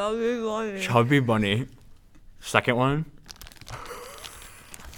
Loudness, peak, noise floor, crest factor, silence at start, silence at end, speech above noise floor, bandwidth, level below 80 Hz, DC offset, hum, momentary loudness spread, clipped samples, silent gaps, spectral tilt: -24 LUFS; -2 dBFS; -49 dBFS; 26 dB; 0 s; 0 s; 25 dB; 18.5 kHz; -50 dBFS; under 0.1%; none; 22 LU; under 0.1%; none; -5.5 dB/octave